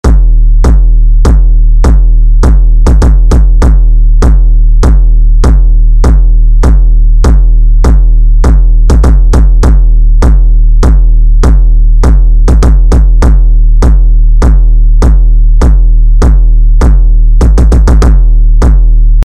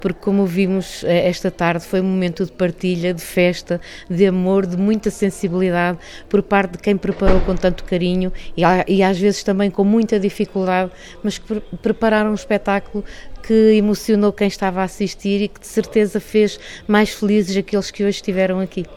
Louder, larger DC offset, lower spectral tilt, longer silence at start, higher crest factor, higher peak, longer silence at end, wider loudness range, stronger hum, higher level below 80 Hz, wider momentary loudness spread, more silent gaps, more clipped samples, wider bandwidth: first, -8 LUFS vs -18 LUFS; first, 2% vs under 0.1%; about the same, -7.5 dB/octave vs -6.5 dB/octave; about the same, 0.05 s vs 0 s; second, 2 dB vs 18 dB; about the same, 0 dBFS vs 0 dBFS; about the same, 0 s vs 0 s; about the same, 0 LU vs 2 LU; neither; first, -2 dBFS vs -32 dBFS; second, 2 LU vs 7 LU; neither; neither; second, 7.8 kHz vs 13.5 kHz